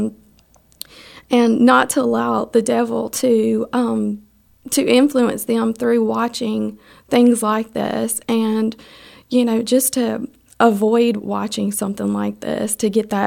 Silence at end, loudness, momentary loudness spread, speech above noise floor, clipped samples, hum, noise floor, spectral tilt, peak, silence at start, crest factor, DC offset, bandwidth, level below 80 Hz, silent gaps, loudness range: 0 s; -18 LUFS; 10 LU; 36 dB; under 0.1%; none; -53 dBFS; -4.5 dB/octave; 0 dBFS; 0 s; 16 dB; under 0.1%; 17.5 kHz; -58 dBFS; none; 2 LU